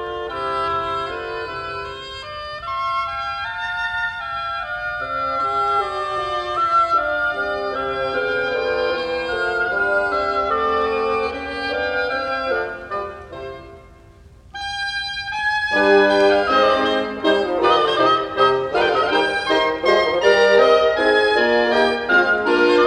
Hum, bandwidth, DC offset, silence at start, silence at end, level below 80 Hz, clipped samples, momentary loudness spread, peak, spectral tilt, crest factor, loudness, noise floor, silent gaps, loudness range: none; 10 kHz; under 0.1%; 0 s; 0 s; -48 dBFS; under 0.1%; 12 LU; -2 dBFS; -4 dB/octave; 18 dB; -19 LUFS; -45 dBFS; none; 9 LU